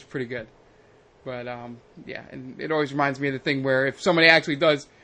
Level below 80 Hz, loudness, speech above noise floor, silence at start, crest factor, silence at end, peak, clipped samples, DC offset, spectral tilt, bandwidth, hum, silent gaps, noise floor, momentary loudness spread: -62 dBFS; -22 LUFS; 31 dB; 0.15 s; 24 dB; 0.2 s; 0 dBFS; under 0.1%; under 0.1%; -5 dB/octave; 9.6 kHz; none; none; -55 dBFS; 22 LU